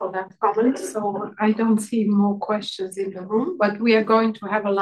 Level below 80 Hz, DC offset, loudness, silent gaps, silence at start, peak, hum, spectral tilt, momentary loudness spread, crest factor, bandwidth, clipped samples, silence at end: -72 dBFS; under 0.1%; -22 LUFS; none; 0 s; -6 dBFS; none; -6 dB/octave; 9 LU; 16 dB; 12.5 kHz; under 0.1%; 0 s